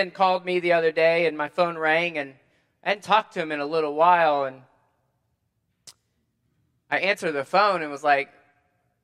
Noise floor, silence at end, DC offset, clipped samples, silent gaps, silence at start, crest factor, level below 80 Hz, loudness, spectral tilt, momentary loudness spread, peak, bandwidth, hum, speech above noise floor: -74 dBFS; 0.8 s; under 0.1%; under 0.1%; none; 0 s; 20 dB; -80 dBFS; -23 LUFS; -5 dB/octave; 9 LU; -6 dBFS; 12.5 kHz; none; 51 dB